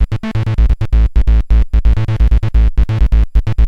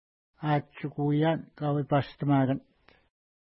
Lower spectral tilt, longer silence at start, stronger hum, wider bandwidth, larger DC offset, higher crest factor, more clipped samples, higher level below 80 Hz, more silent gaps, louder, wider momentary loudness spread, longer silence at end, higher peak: second, -8.5 dB/octave vs -11.5 dB/octave; second, 0 s vs 0.4 s; neither; second, 5 kHz vs 5.8 kHz; neither; second, 10 dB vs 16 dB; neither; first, -12 dBFS vs -64 dBFS; neither; first, -14 LUFS vs -29 LUFS; second, 3 LU vs 8 LU; second, 0 s vs 0.85 s; first, 0 dBFS vs -14 dBFS